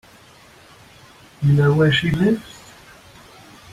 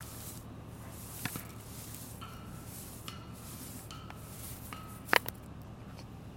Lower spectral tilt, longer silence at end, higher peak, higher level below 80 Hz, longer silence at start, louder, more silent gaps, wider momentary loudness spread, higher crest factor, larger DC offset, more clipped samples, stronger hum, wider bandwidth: first, -7 dB/octave vs -3.5 dB/octave; first, 1.25 s vs 0 s; about the same, -6 dBFS vs -6 dBFS; first, -46 dBFS vs -56 dBFS; first, 1.4 s vs 0 s; first, -18 LUFS vs -40 LUFS; neither; about the same, 19 LU vs 18 LU; second, 16 dB vs 36 dB; neither; neither; neither; second, 12.5 kHz vs 17 kHz